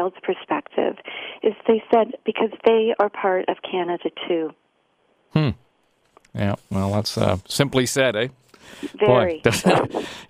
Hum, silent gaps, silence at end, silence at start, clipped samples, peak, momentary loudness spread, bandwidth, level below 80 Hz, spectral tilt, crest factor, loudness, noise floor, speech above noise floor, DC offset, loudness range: none; none; 0.05 s; 0 s; under 0.1%; 0 dBFS; 10 LU; 15.5 kHz; -54 dBFS; -5 dB/octave; 22 dB; -22 LUFS; -65 dBFS; 43 dB; under 0.1%; 6 LU